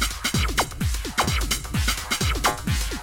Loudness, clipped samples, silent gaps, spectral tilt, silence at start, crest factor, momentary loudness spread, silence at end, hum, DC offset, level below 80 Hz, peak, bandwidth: -24 LUFS; under 0.1%; none; -3 dB/octave; 0 s; 16 dB; 4 LU; 0 s; none; under 0.1%; -30 dBFS; -8 dBFS; 17 kHz